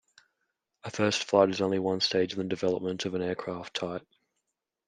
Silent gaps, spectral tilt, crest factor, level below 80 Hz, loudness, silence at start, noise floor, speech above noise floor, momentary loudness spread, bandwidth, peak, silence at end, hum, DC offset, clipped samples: none; -4.5 dB/octave; 24 dB; -72 dBFS; -29 LUFS; 0.85 s; -83 dBFS; 55 dB; 12 LU; 10 kHz; -8 dBFS; 0.85 s; none; under 0.1%; under 0.1%